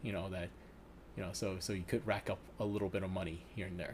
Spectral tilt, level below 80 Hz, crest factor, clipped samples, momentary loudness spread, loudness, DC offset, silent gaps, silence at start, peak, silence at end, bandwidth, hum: -5.5 dB/octave; -58 dBFS; 20 dB; under 0.1%; 12 LU; -41 LUFS; under 0.1%; none; 0 s; -20 dBFS; 0 s; 15.5 kHz; none